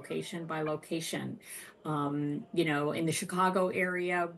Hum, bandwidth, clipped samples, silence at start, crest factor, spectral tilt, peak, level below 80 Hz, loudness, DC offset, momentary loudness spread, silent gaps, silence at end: none; 12.5 kHz; under 0.1%; 0 s; 16 dB; -5 dB/octave; -16 dBFS; -78 dBFS; -33 LUFS; under 0.1%; 10 LU; none; 0 s